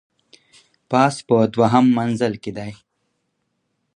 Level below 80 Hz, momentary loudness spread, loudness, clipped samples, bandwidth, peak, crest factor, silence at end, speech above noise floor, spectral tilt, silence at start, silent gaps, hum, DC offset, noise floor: -60 dBFS; 15 LU; -18 LUFS; under 0.1%; 10.5 kHz; 0 dBFS; 20 dB; 1.2 s; 55 dB; -6.5 dB/octave; 0.9 s; none; none; under 0.1%; -72 dBFS